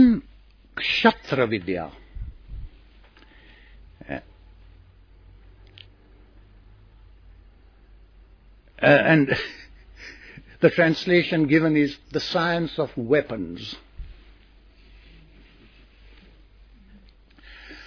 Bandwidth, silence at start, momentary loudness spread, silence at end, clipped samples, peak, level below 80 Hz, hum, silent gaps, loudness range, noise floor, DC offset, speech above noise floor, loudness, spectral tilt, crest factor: 5.4 kHz; 0 s; 25 LU; 0.05 s; under 0.1%; -4 dBFS; -48 dBFS; none; none; 23 LU; -52 dBFS; under 0.1%; 31 dB; -22 LUFS; -7 dB/octave; 22 dB